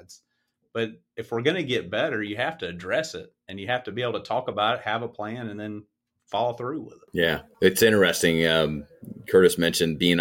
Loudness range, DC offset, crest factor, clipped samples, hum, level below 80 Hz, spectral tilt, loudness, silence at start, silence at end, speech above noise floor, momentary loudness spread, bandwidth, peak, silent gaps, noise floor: 7 LU; under 0.1%; 20 dB; under 0.1%; none; -56 dBFS; -4 dB/octave; -24 LUFS; 0.1 s; 0 s; 50 dB; 17 LU; 17 kHz; -6 dBFS; none; -75 dBFS